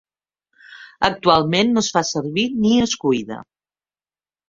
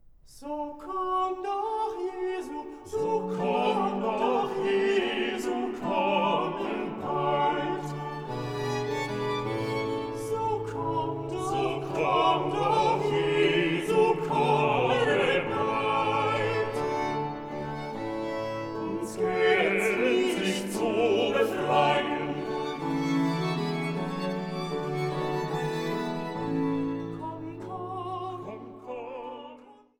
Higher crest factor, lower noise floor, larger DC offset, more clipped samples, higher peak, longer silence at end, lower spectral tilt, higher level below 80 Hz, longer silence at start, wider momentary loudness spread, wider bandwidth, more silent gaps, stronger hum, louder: about the same, 20 dB vs 18 dB; first, under -90 dBFS vs -51 dBFS; neither; neither; first, -2 dBFS vs -10 dBFS; first, 1.1 s vs 0.25 s; second, -4 dB/octave vs -5.5 dB/octave; first, -52 dBFS vs -58 dBFS; first, 0.7 s vs 0.25 s; second, 7 LU vs 11 LU; second, 7.6 kHz vs 16 kHz; neither; first, 50 Hz at -50 dBFS vs none; first, -18 LUFS vs -28 LUFS